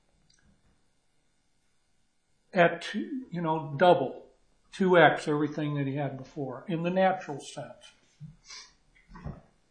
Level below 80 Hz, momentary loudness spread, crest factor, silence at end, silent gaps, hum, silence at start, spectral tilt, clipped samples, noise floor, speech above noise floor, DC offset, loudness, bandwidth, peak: -62 dBFS; 23 LU; 24 dB; 0.35 s; none; none; 2.55 s; -6.5 dB/octave; under 0.1%; -70 dBFS; 42 dB; under 0.1%; -27 LUFS; 10 kHz; -6 dBFS